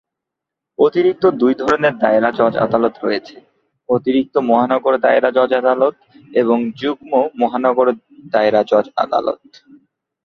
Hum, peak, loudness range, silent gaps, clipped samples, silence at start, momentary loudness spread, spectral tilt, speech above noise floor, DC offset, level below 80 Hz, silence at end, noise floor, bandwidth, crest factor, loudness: none; 0 dBFS; 1 LU; none; under 0.1%; 0.8 s; 7 LU; -7 dB/octave; 67 dB; under 0.1%; -58 dBFS; 0.9 s; -82 dBFS; 7 kHz; 16 dB; -16 LUFS